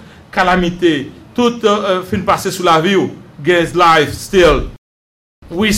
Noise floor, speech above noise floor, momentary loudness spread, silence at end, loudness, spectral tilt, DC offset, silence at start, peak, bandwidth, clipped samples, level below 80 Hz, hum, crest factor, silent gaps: under -90 dBFS; over 77 dB; 11 LU; 0 s; -13 LUFS; -4.5 dB/octave; under 0.1%; 0.35 s; -2 dBFS; 16 kHz; under 0.1%; -32 dBFS; none; 12 dB; 4.78-5.42 s